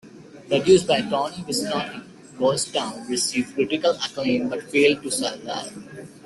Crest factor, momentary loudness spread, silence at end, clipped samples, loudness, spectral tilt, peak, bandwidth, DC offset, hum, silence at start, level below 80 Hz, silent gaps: 20 dB; 14 LU; 0.05 s; under 0.1%; -22 LUFS; -3.5 dB/octave; -4 dBFS; 12.5 kHz; under 0.1%; none; 0.05 s; -60 dBFS; none